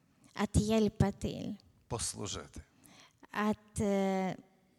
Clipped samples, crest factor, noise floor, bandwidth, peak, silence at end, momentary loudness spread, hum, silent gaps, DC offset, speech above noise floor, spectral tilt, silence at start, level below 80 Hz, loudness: under 0.1%; 20 dB; -61 dBFS; 14 kHz; -14 dBFS; 0.4 s; 18 LU; none; none; under 0.1%; 28 dB; -5.5 dB/octave; 0.35 s; -50 dBFS; -34 LUFS